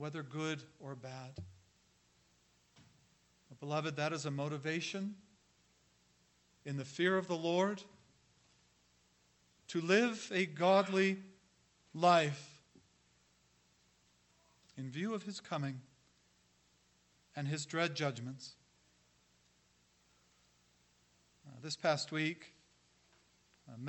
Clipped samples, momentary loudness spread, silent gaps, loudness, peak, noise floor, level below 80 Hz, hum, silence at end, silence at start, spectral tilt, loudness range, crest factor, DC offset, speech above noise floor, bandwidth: under 0.1%; 21 LU; none; -36 LUFS; -14 dBFS; -73 dBFS; -80 dBFS; 60 Hz at -65 dBFS; 0 s; 0 s; -5 dB/octave; 12 LU; 26 dB; under 0.1%; 36 dB; 8.4 kHz